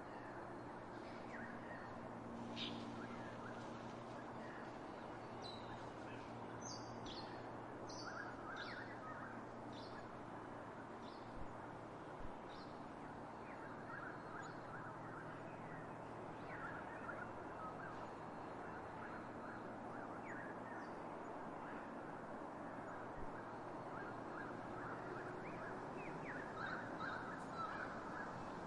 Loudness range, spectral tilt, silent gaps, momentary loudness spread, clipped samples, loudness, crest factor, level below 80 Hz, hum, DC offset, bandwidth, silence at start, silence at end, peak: 4 LU; -5.5 dB/octave; none; 5 LU; under 0.1%; -51 LUFS; 18 dB; -70 dBFS; none; under 0.1%; 11 kHz; 0 s; 0 s; -34 dBFS